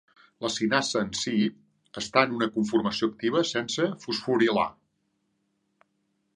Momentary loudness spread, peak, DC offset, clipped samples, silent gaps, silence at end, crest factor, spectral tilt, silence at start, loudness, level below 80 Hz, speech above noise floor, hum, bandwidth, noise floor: 8 LU; -4 dBFS; under 0.1%; under 0.1%; none; 1.65 s; 24 dB; -4 dB/octave; 0.4 s; -26 LUFS; -66 dBFS; 48 dB; none; 11 kHz; -75 dBFS